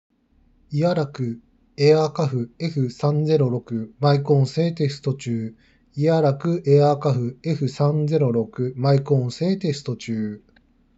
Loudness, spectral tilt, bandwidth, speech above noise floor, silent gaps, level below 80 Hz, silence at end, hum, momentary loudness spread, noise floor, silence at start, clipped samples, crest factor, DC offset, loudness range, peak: -22 LUFS; -8 dB/octave; 7.8 kHz; 39 dB; none; -62 dBFS; 0.6 s; none; 11 LU; -59 dBFS; 0.7 s; under 0.1%; 16 dB; under 0.1%; 2 LU; -4 dBFS